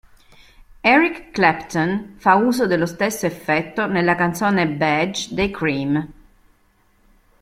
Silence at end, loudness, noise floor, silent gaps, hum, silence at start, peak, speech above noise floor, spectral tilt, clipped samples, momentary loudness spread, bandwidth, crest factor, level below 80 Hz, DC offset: 1.3 s; -19 LUFS; -59 dBFS; none; none; 0.85 s; -2 dBFS; 40 dB; -5 dB/octave; under 0.1%; 7 LU; 16 kHz; 18 dB; -48 dBFS; under 0.1%